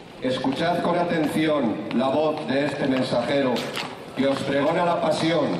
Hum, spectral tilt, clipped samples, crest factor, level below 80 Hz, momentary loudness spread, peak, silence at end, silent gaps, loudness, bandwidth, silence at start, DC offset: none; -6 dB/octave; under 0.1%; 12 dB; -60 dBFS; 4 LU; -10 dBFS; 0 s; none; -23 LUFS; 14.5 kHz; 0 s; under 0.1%